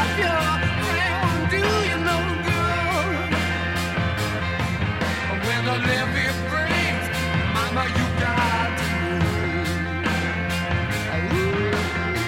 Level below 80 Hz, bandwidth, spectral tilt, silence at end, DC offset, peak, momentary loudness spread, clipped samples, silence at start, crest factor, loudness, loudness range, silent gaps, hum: -40 dBFS; 16.5 kHz; -5 dB/octave; 0 s; under 0.1%; -8 dBFS; 3 LU; under 0.1%; 0 s; 14 dB; -22 LUFS; 2 LU; none; none